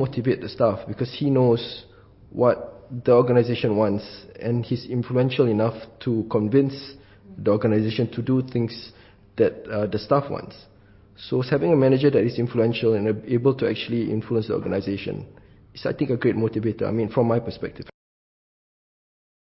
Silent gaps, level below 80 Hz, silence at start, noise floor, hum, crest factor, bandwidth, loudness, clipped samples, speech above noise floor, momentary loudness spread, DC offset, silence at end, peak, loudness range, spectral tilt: none; -54 dBFS; 0 s; -52 dBFS; none; 18 dB; 5.8 kHz; -23 LUFS; under 0.1%; 29 dB; 15 LU; under 0.1%; 1.55 s; -6 dBFS; 4 LU; -11.5 dB/octave